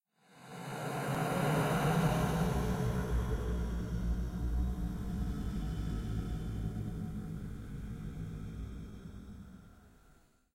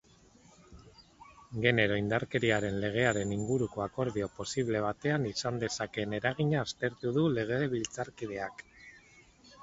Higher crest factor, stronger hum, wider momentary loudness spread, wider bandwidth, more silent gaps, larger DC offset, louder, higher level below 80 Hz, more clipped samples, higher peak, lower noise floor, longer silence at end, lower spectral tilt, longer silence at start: about the same, 18 dB vs 22 dB; neither; first, 16 LU vs 9 LU; first, 16 kHz vs 8 kHz; neither; neither; second, -36 LUFS vs -32 LUFS; first, -42 dBFS vs -58 dBFS; neither; second, -18 dBFS vs -10 dBFS; first, -65 dBFS vs -61 dBFS; first, 0.45 s vs 0 s; about the same, -6.5 dB/octave vs -5.5 dB/octave; second, 0.35 s vs 0.7 s